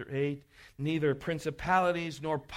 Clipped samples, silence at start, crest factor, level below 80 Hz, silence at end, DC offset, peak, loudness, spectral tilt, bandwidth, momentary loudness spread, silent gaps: under 0.1%; 0 s; 18 dB; -56 dBFS; 0 s; under 0.1%; -14 dBFS; -31 LUFS; -6.5 dB/octave; 15.5 kHz; 8 LU; none